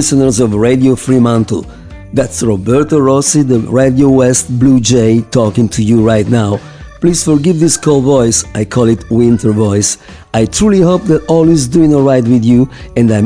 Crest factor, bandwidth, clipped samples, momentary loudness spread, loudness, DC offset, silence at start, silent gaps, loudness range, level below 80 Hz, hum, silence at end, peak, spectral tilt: 10 dB; 10.5 kHz; 0.2%; 6 LU; -10 LUFS; 0.2%; 0 s; none; 2 LU; -34 dBFS; none; 0 s; 0 dBFS; -6 dB/octave